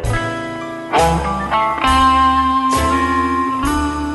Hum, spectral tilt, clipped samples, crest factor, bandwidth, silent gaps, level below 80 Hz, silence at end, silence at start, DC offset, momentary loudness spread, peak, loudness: none; -5 dB/octave; under 0.1%; 14 dB; 12 kHz; none; -28 dBFS; 0 s; 0 s; under 0.1%; 9 LU; -2 dBFS; -15 LUFS